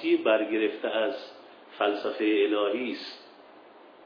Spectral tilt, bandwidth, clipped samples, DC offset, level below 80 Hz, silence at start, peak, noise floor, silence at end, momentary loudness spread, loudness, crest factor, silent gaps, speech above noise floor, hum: -5.5 dB/octave; 5.4 kHz; under 0.1%; under 0.1%; -82 dBFS; 0 s; -10 dBFS; -52 dBFS; 0.15 s; 17 LU; -27 LUFS; 18 dB; none; 25 dB; none